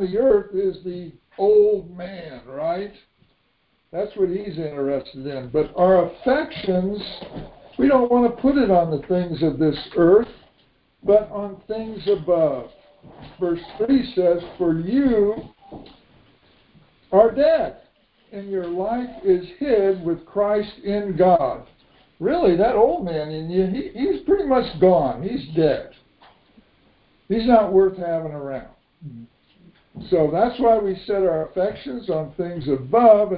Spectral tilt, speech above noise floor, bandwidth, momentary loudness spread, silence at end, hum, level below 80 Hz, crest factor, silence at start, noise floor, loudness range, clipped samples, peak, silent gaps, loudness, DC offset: -11.5 dB/octave; 46 dB; 5 kHz; 15 LU; 0 s; none; -48 dBFS; 20 dB; 0 s; -66 dBFS; 4 LU; under 0.1%; -2 dBFS; none; -20 LUFS; under 0.1%